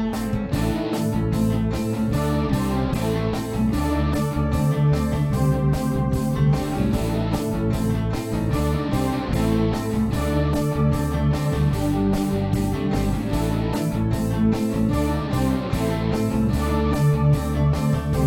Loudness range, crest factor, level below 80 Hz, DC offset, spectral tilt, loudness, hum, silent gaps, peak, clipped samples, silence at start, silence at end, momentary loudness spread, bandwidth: 1 LU; 12 dB; -30 dBFS; under 0.1%; -7.5 dB/octave; -22 LUFS; none; none; -8 dBFS; under 0.1%; 0 s; 0 s; 3 LU; 17 kHz